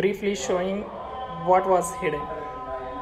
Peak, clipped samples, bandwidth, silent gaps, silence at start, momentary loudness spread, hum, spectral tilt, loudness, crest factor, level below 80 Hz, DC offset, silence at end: -6 dBFS; under 0.1%; 14.5 kHz; none; 0 s; 13 LU; none; -4.5 dB/octave; -26 LUFS; 18 dB; -50 dBFS; under 0.1%; 0 s